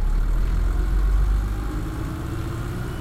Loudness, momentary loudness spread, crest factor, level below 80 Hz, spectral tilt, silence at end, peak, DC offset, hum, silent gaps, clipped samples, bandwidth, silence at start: -26 LUFS; 6 LU; 10 dB; -22 dBFS; -7 dB/octave; 0 s; -12 dBFS; under 0.1%; none; none; under 0.1%; 13.5 kHz; 0 s